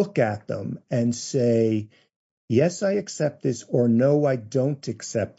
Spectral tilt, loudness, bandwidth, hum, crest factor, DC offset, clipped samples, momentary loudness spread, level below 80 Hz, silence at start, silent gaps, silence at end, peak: -6.5 dB/octave; -24 LUFS; 8 kHz; none; 16 dB; under 0.1%; under 0.1%; 10 LU; -70 dBFS; 0 s; 2.16-2.48 s; 0.1 s; -8 dBFS